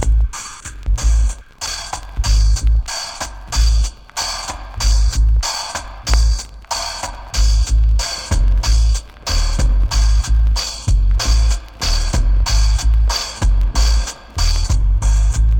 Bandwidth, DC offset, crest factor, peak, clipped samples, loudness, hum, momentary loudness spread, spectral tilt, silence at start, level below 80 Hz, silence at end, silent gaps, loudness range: 10.5 kHz; under 0.1%; 12 dB; -2 dBFS; under 0.1%; -18 LUFS; none; 8 LU; -3.5 dB/octave; 0 s; -16 dBFS; 0 s; none; 2 LU